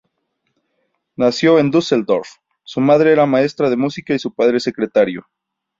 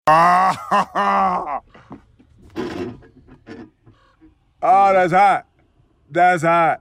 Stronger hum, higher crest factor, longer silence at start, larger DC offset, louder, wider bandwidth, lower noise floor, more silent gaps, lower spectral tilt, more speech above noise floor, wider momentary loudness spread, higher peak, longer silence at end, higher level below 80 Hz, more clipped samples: neither; about the same, 14 dB vs 16 dB; first, 1.2 s vs 0.05 s; neither; about the same, -16 LUFS vs -16 LUFS; second, 7.8 kHz vs 14.5 kHz; first, -71 dBFS vs -58 dBFS; neither; about the same, -6 dB/octave vs -5.5 dB/octave; first, 56 dB vs 42 dB; second, 8 LU vs 17 LU; about the same, -2 dBFS vs -4 dBFS; first, 0.6 s vs 0.05 s; second, -60 dBFS vs -54 dBFS; neither